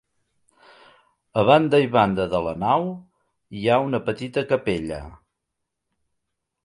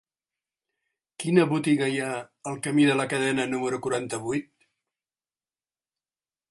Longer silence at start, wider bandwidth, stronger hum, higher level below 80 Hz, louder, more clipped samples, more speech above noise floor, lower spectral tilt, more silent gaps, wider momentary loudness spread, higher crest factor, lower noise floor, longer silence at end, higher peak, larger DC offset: first, 1.35 s vs 1.2 s; about the same, 11.5 kHz vs 11.5 kHz; neither; first, -52 dBFS vs -70 dBFS; first, -21 LUFS vs -25 LUFS; neither; second, 59 dB vs over 65 dB; first, -7 dB/octave vs -5 dB/octave; neither; first, 15 LU vs 11 LU; about the same, 20 dB vs 24 dB; second, -80 dBFS vs under -90 dBFS; second, 1.5 s vs 2.1 s; about the same, -2 dBFS vs -4 dBFS; neither